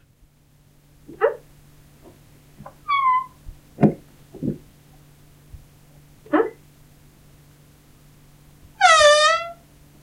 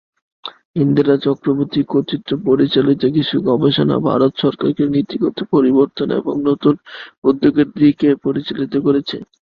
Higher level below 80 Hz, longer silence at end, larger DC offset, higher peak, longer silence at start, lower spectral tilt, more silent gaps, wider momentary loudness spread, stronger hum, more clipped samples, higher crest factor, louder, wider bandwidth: about the same, -52 dBFS vs -54 dBFS; first, 0.5 s vs 0.35 s; neither; about the same, 0 dBFS vs 0 dBFS; first, 1.1 s vs 0.45 s; second, -3.5 dB/octave vs -9.5 dB/octave; second, none vs 0.65-0.74 s, 7.18-7.22 s; first, 25 LU vs 8 LU; neither; neither; first, 24 dB vs 16 dB; second, -19 LUFS vs -16 LUFS; first, 16 kHz vs 5.2 kHz